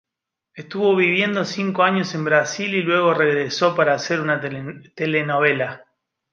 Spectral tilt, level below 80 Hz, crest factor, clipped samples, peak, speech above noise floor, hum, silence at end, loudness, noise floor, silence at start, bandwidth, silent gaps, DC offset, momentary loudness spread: -5 dB/octave; -68 dBFS; 18 dB; under 0.1%; -2 dBFS; 65 dB; none; 0.55 s; -19 LUFS; -84 dBFS; 0.55 s; 7.4 kHz; none; under 0.1%; 9 LU